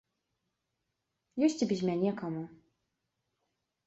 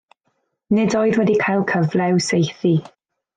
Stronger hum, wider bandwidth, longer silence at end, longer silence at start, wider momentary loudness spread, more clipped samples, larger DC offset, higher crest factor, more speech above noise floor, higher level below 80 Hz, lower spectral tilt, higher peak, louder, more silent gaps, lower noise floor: neither; second, 8.2 kHz vs 9.4 kHz; first, 1.3 s vs 0.55 s; first, 1.35 s vs 0.7 s; first, 13 LU vs 3 LU; neither; neither; first, 20 dB vs 12 dB; about the same, 53 dB vs 53 dB; second, -76 dBFS vs -60 dBFS; about the same, -6.5 dB/octave vs -6 dB/octave; second, -16 dBFS vs -6 dBFS; second, -32 LUFS vs -18 LUFS; neither; first, -84 dBFS vs -70 dBFS